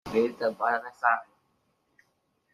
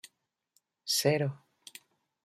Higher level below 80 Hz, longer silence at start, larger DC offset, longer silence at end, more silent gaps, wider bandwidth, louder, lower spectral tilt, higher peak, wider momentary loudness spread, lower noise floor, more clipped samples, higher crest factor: first, -68 dBFS vs -76 dBFS; second, 0.05 s vs 0.85 s; neither; first, 1.3 s vs 0.9 s; neither; second, 13.5 kHz vs 16 kHz; about the same, -28 LUFS vs -29 LUFS; first, -5.5 dB/octave vs -3.5 dB/octave; first, -8 dBFS vs -14 dBFS; second, 2 LU vs 23 LU; about the same, -73 dBFS vs -75 dBFS; neither; about the same, 22 dB vs 22 dB